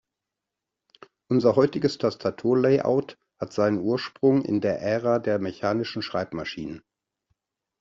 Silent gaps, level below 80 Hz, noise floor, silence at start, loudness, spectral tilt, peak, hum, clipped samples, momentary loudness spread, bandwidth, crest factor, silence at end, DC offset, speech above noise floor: none; -64 dBFS; -86 dBFS; 1.3 s; -24 LUFS; -6 dB/octave; -6 dBFS; none; under 0.1%; 12 LU; 7.6 kHz; 18 dB; 1 s; under 0.1%; 63 dB